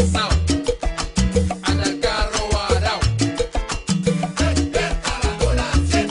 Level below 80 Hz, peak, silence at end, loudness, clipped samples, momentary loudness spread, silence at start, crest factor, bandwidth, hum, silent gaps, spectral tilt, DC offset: -24 dBFS; -4 dBFS; 0 s; -21 LUFS; under 0.1%; 4 LU; 0 s; 14 dB; 11 kHz; none; none; -5 dB/octave; under 0.1%